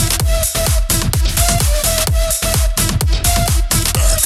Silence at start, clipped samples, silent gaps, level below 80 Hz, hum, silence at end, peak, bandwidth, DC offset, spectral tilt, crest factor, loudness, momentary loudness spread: 0 s; under 0.1%; none; -18 dBFS; none; 0 s; 0 dBFS; 16.5 kHz; under 0.1%; -3 dB/octave; 14 dB; -14 LUFS; 2 LU